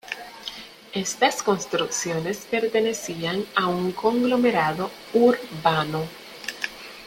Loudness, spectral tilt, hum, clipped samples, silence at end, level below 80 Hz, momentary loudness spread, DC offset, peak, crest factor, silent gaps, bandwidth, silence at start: -24 LUFS; -4 dB/octave; none; under 0.1%; 0 s; -60 dBFS; 14 LU; under 0.1%; -4 dBFS; 20 dB; none; 16.5 kHz; 0.05 s